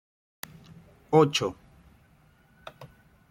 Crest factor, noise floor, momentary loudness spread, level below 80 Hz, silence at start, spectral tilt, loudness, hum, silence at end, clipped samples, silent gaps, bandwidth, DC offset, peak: 24 dB; -60 dBFS; 26 LU; -64 dBFS; 1.1 s; -5 dB/octave; -24 LUFS; none; 0.45 s; under 0.1%; none; 16.5 kHz; under 0.1%; -8 dBFS